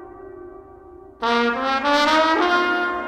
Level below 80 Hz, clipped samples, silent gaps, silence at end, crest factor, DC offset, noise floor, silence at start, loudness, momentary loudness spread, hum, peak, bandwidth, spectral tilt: -52 dBFS; under 0.1%; none; 0 s; 18 dB; under 0.1%; -43 dBFS; 0 s; -19 LUFS; 23 LU; none; -4 dBFS; 16.5 kHz; -3 dB/octave